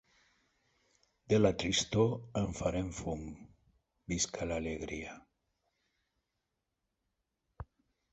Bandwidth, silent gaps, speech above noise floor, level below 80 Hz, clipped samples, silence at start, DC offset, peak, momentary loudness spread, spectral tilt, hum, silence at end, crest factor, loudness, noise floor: 8.2 kHz; none; 52 dB; -54 dBFS; under 0.1%; 1.3 s; under 0.1%; -14 dBFS; 23 LU; -4.5 dB/octave; none; 0.5 s; 24 dB; -34 LUFS; -86 dBFS